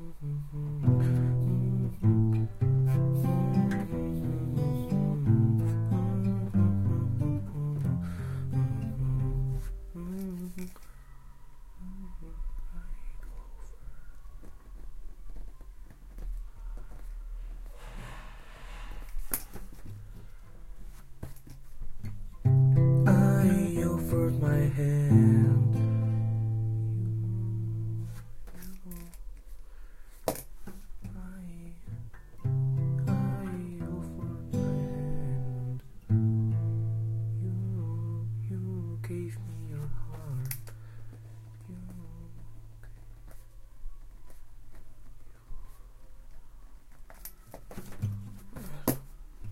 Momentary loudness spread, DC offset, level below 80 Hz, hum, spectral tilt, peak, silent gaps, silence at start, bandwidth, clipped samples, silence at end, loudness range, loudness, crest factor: 23 LU; under 0.1%; -44 dBFS; none; -8.5 dB/octave; -8 dBFS; none; 0 s; 16 kHz; under 0.1%; 0 s; 22 LU; -29 LUFS; 22 dB